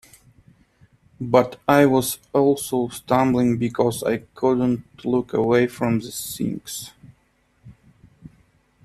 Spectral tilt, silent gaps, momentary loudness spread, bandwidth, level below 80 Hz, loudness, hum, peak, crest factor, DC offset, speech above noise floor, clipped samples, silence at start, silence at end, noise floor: -5.5 dB/octave; none; 10 LU; 13.5 kHz; -54 dBFS; -21 LUFS; none; -2 dBFS; 22 dB; under 0.1%; 43 dB; under 0.1%; 1.2 s; 0.6 s; -63 dBFS